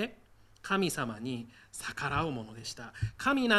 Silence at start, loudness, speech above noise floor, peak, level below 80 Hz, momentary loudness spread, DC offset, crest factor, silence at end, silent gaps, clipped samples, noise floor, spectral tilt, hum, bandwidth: 0 s; -34 LUFS; 27 dB; -12 dBFS; -56 dBFS; 11 LU; under 0.1%; 22 dB; 0 s; none; under 0.1%; -59 dBFS; -4.5 dB/octave; none; 15 kHz